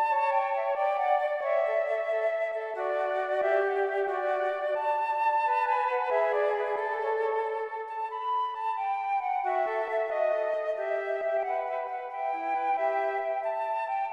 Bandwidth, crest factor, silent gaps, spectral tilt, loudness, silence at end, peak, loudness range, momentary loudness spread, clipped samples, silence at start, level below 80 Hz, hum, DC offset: 8.6 kHz; 14 dB; none; -3 dB/octave; -29 LUFS; 0 s; -14 dBFS; 3 LU; 5 LU; under 0.1%; 0 s; -82 dBFS; none; under 0.1%